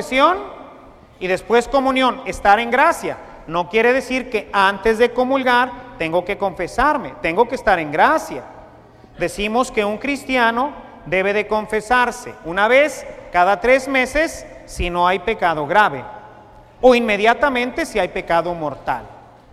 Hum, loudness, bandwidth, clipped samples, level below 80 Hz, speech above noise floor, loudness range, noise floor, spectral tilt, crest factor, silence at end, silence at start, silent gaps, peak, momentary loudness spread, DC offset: none; -18 LUFS; 14.5 kHz; under 0.1%; -40 dBFS; 27 dB; 2 LU; -44 dBFS; -4 dB/octave; 18 dB; 0.4 s; 0 s; none; 0 dBFS; 11 LU; under 0.1%